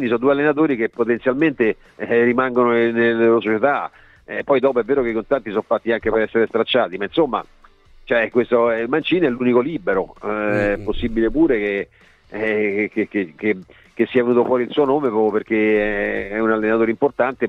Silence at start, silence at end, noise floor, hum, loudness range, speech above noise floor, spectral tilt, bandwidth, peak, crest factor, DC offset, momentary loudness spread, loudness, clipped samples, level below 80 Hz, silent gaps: 0 s; 0 s; -48 dBFS; none; 3 LU; 29 dB; -8 dB/octave; 5.2 kHz; -2 dBFS; 16 dB; under 0.1%; 7 LU; -19 LUFS; under 0.1%; -42 dBFS; none